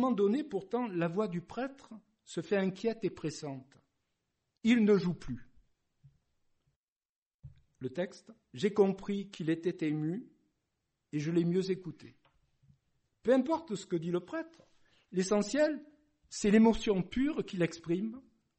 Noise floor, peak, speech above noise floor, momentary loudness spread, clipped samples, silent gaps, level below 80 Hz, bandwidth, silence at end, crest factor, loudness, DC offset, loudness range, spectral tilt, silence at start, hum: -84 dBFS; -14 dBFS; 52 dB; 15 LU; under 0.1%; 6.76-6.96 s, 7.05-7.39 s; -60 dBFS; 8.4 kHz; 0.4 s; 20 dB; -33 LUFS; under 0.1%; 6 LU; -6.5 dB/octave; 0 s; none